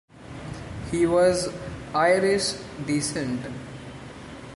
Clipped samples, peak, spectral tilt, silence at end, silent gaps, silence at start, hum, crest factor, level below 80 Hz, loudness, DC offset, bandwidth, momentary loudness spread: under 0.1%; -8 dBFS; -4.5 dB/octave; 0 s; none; 0.15 s; none; 18 dB; -48 dBFS; -24 LUFS; under 0.1%; 11.5 kHz; 20 LU